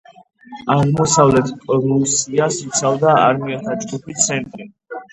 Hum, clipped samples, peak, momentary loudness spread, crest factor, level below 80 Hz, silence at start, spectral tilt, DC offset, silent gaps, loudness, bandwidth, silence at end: none; under 0.1%; 0 dBFS; 15 LU; 16 dB; -48 dBFS; 0.5 s; -4.5 dB/octave; under 0.1%; none; -16 LUFS; 10.5 kHz; 0.1 s